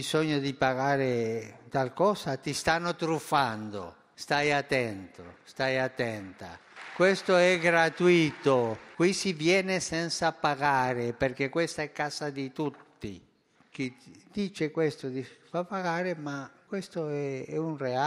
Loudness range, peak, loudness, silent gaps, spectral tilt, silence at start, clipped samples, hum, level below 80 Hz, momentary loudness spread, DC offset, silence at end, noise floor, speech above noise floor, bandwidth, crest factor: 9 LU; -8 dBFS; -29 LUFS; none; -5 dB/octave; 0 s; under 0.1%; none; -64 dBFS; 17 LU; under 0.1%; 0 s; -65 dBFS; 36 dB; 15 kHz; 20 dB